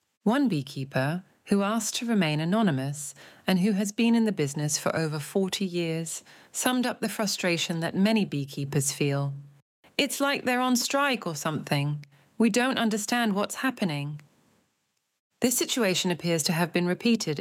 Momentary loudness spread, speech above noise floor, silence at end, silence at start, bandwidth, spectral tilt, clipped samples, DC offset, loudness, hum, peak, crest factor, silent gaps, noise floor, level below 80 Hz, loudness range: 8 LU; 50 dB; 0 s; 0.25 s; 17 kHz; -4.5 dB/octave; under 0.1%; under 0.1%; -27 LUFS; none; -8 dBFS; 18 dB; 9.62-9.83 s, 15.20-15.30 s; -76 dBFS; -74 dBFS; 2 LU